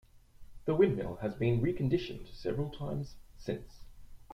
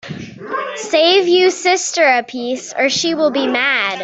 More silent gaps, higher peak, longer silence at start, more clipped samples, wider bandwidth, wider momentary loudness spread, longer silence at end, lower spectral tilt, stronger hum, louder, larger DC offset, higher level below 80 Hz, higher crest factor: neither; second, -14 dBFS vs 0 dBFS; about the same, 0.15 s vs 0.05 s; neither; first, 14 kHz vs 8.2 kHz; about the same, 13 LU vs 12 LU; about the same, 0 s vs 0 s; first, -8.5 dB/octave vs -2 dB/octave; neither; second, -34 LUFS vs -15 LUFS; neither; first, -52 dBFS vs -62 dBFS; first, 20 dB vs 14 dB